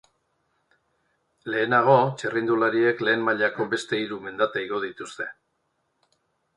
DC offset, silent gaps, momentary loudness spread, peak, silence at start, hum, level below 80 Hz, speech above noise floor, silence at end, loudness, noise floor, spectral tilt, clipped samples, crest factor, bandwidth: under 0.1%; none; 14 LU; -4 dBFS; 1.45 s; none; -70 dBFS; 50 dB; 1.25 s; -24 LUFS; -74 dBFS; -5.5 dB/octave; under 0.1%; 22 dB; 11 kHz